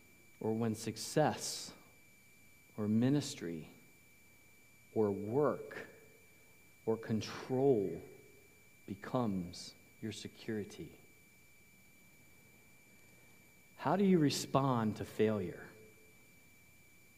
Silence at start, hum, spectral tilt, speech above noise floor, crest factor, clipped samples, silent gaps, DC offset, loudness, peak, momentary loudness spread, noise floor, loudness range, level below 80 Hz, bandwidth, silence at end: 0.4 s; none; -6 dB/octave; 29 dB; 22 dB; under 0.1%; none; under 0.1%; -36 LUFS; -16 dBFS; 18 LU; -64 dBFS; 13 LU; -76 dBFS; 15.5 kHz; 1.3 s